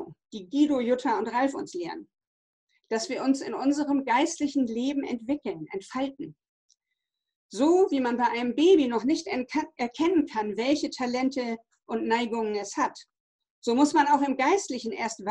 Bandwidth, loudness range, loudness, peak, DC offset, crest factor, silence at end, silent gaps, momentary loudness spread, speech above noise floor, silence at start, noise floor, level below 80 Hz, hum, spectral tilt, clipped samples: 10 kHz; 4 LU; -27 LUFS; -10 dBFS; under 0.1%; 16 dB; 0 s; 2.27-2.67 s, 6.49-6.69 s, 7.36-7.49 s, 13.20-13.39 s, 13.50-13.62 s; 13 LU; 58 dB; 0 s; -84 dBFS; -68 dBFS; none; -4 dB/octave; under 0.1%